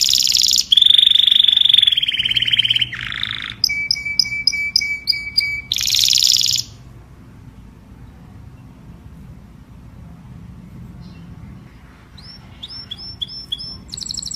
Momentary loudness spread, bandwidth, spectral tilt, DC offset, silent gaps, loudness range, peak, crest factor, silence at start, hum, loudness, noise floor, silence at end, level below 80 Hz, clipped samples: 19 LU; 15.5 kHz; 1 dB/octave; under 0.1%; none; 20 LU; 0 dBFS; 20 dB; 0 s; none; -13 LUFS; -42 dBFS; 0 s; -46 dBFS; under 0.1%